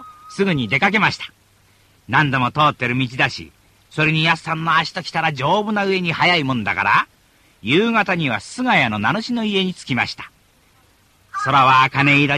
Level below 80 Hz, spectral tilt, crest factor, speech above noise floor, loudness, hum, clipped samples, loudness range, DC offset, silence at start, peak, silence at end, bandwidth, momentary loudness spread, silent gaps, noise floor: -54 dBFS; -5.5 dB/octave; 16 dB; 38 dB; -17 LUFS; none; under 0.1%; 2 LU; under 0.1%; 0 s; -2 dBFS; 0 s; 14 kHz; 10 LU; none; -55 dBFS